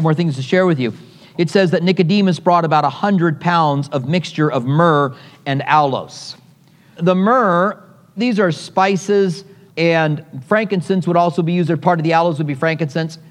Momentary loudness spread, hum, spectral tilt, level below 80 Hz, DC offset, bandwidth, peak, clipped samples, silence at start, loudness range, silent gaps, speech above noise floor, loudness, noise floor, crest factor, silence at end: 9 LU; none; -7 dB/octave; -68 dBFS; under 0.1%; 10.5 kHz; 0 dBFS; under 0.1%; 0 s; 2 LU; none; 33 dB; -16 LUFS; -48 dBFS; 16 dB; 0.1 s